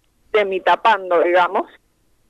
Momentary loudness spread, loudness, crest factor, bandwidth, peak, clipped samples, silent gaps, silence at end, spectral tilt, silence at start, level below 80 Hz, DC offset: 8 LU; -17 LUFS; 14 dB; 10.5 kHz; -4 dBFS; under 0.1%; none; 0.65 s; -4.5 dB/octave; 0.35 s; -62 dBFS; under 0.1%